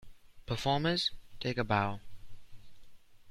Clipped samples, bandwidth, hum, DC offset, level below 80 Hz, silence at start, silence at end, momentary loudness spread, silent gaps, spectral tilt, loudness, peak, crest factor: under 0.1%; 14.5 kHz; none; under 0.1%; -54 dBFS; 0 s; 0 s; 10 LU; none; -5.5 dB/octave; -33 LUFS; -14 dBFS; 20 dB